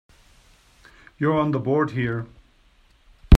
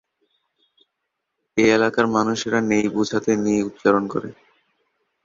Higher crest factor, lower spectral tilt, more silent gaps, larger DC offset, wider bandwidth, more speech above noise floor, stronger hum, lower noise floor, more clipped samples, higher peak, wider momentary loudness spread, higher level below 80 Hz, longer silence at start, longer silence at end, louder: about the same, 22 dB vs 20 dB; first, -8 dB/octave vs -5 dB/octave; neither; neither; first, 9.6 kHz vs 7.6 kHz; second, 35 dB vs 59 dB; neither; second, -57 dBFS vs -78 dBFS; neither; about the same, 0 dBFS vs -2 dBFS; about the same, 9 LU vs 10 LU; first, -26 dBFS vs -60 dBFS; second, 1.2 s vs 1.55 s; second, 0 s vs 0.9 s; second, -24 LUFS vs -20 LUFS